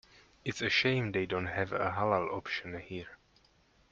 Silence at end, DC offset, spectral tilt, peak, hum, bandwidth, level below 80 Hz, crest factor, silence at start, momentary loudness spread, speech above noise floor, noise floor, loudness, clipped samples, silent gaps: 0.75 s; under 0.1%; -5 dB/octave; -14 dBFS; none; 7.6 kHz; -64 dBFS; 20 dB; 0.45 s; 14 LU; 34 dB; -67 dBFS; -33 LUFS; under 0.1%; none